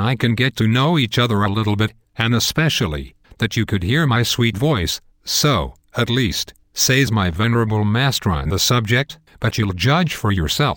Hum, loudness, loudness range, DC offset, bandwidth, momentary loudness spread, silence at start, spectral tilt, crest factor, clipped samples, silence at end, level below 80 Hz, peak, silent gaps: none; -18 LUFS; 1 LU; under 0.1%; 17 kHz; 7 LU; 0 s; -4.5 dB/octave; 16 dB; under 0.1%; 0 s; -38 dBFS; -2 dBFS; none